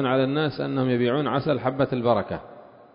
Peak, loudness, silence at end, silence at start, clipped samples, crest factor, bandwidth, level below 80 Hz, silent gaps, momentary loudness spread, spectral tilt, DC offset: -6 dBFS; -24 LUFS; 0.3 s; 0 s; under 0.1%; 18 dB; 5.4 kHz; -56 dBFS; none; 3 LU; -11.5 dB/octave; under 0.1%